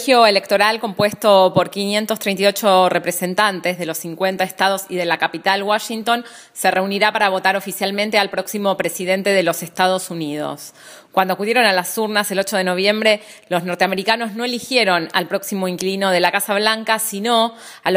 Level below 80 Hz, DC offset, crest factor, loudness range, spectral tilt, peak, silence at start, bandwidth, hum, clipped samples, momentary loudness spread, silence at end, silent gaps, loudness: -68 dBFS; under 0.1%; 18 dB; 3 LU; -3.5 dB/octave; 0 dBFS; 0 s; 16 kHz; none; under 0.1%; 8 LU; 0 s; none; -17 LUFS